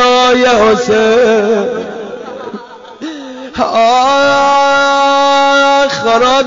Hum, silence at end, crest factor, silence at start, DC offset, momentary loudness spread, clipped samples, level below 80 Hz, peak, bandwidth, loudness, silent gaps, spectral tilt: none; 0 s; 8 dB; 0 s; under 0.1%; 17 LU; under 0.1%; -46 dBFS; -2 dBFS; 7.6 kHz; -9 LUFS; none; -1 dB/octave